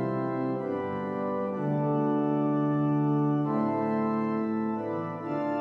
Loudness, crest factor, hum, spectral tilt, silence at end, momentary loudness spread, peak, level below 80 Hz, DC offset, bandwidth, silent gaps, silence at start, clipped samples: -29 LUFS; 12 dB; none; -10.5 dB/octave; 0 s; 6 LU; -16 dBFS; -76 dBFS; under 0.1%; 5.6 kHz; none; 0 s; under 0.1%